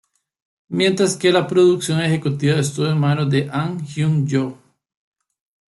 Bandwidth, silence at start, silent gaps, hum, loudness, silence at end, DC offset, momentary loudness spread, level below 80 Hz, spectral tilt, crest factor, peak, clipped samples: 12 kHz; 0.7 s; none; none; -18 LUFS; 1.15 s; under 0.1%; 8 LU; -58 dBFS; -6 dB/octave; 16 dB; -2 dBFS; under 0.1%